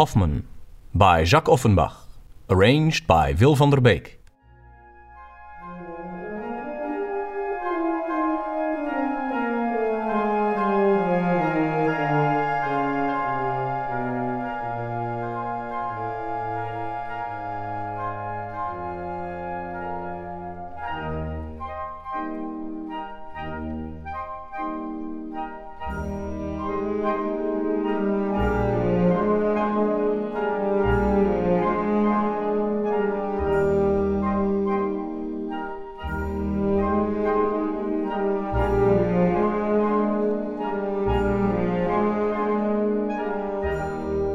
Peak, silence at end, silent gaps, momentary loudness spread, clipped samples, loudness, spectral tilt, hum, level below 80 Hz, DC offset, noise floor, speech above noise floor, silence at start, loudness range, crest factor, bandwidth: -2 dBFS; 0 s; none; 13 LU; under 0.1%; -24 LUFS; -7 dB/octave; none; -40 dBFS; under 0.1%; -50 dBFS; 32 dB; 0 s; 11 LU; 20 dB; 14 kHz